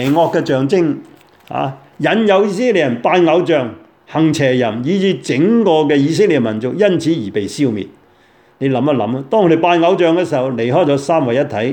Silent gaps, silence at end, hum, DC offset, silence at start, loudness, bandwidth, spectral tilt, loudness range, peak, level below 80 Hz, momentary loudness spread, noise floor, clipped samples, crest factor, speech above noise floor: none; 0 s; none; under 0.1%; 0 s; -14 LUFS; 17.5 kHz; -6.5 dB/octave; 2 LU; 0 dBFS; -60 dBFS; 9 LU; -50 dBFS; under 0.1%; 14 dB; 36 dB